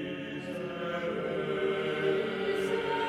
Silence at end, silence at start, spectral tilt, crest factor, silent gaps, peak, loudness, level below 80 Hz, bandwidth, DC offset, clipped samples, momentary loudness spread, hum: 0 s; 0 s; -6 dB/octave; 14 dB; none; -18 dBFS; -32 LUFS; -64 dBFS; 13 kHz; under 0.1%; under 0.1%; 7 LU; none